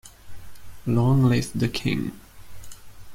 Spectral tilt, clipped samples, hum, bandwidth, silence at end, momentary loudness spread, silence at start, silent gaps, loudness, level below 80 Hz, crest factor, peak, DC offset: -6.5 dB/octave; under 0.1%; none; 16 kHz; 0 s; 19 LU; 0.05 s; none; -23 LUFS; -48 dBFS; 18 dB; -8 dBFS; under 0.1%